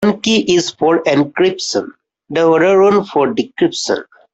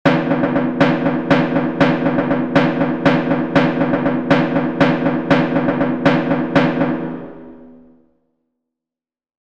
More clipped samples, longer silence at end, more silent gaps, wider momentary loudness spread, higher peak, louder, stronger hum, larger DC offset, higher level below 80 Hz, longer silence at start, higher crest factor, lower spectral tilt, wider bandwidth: neither; second, 0.3 s vs 1.8 s; neither; first, 9 LU vs 3 LU; about the same, -2 dBFS vs 0 dBFS; about the same, -14 LUFS vs -16 LUFS; neither; second, under 0.1% vs 1%; second, -56 dBFS vs -50 dBFS; about the same, 0 s vs 0.05 s; about the same, 12 dB vs 16 dB; second, -4.5 dB/octave vs -8 dB/octave; first, 8.2 kHz vs 7.4 kHz